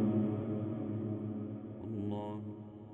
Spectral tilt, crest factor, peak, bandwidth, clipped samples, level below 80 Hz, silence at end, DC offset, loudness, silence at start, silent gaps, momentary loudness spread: -11.5 dB/octave; 16 dB; -20 dBFS; 3.8 kHz; under 0.1%; -68 dBFS; 0 s; under 0.1%; -39 LUFS; 0 s; none; 10 LU